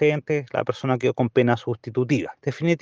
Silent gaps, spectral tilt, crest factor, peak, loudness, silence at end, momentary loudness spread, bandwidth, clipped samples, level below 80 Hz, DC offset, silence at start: none; -7.5 dB/octave; 18 dB; -4 dBFS; -24 LUFS; 0.05 s; 6 LU; 7.6 kHz; under 0.1%; -66 dBFS; under 0.1%; 0 s